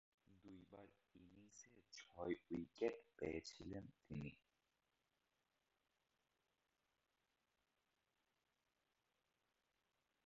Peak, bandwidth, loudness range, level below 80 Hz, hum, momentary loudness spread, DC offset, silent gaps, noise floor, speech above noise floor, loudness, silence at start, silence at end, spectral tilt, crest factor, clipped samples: -30 dBFS; 7.4 kHz; 11 LU; -78 dBFS; none; 19 LU; under 0.1%; none; -89 dBFS; 39 dB; -51 LUFS; 0.3 s; 5.9 s; -5.5 dB/octave; 28 dB; under 0.1%